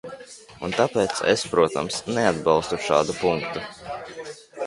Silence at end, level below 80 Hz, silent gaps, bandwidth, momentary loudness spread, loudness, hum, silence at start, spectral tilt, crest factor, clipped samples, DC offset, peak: 0 s; -54 dBFS; none; 11.5 kHz; 17 LU; -23 LUFS; none; 0.05 s; -4 dB/octave; 20 dB; under 0.1%; under 0.1%; -4 dBFS